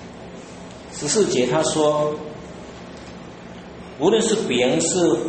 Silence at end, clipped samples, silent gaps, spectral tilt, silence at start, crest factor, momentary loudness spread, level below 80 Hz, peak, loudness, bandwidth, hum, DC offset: 0 s; under 0.1%; none; -4 dB/octave; 0 s; 16 dB; 20 LU; -52 dBFS; -6 dBFS; -20 LUFS; 8.8 kHz; none; under 0.1%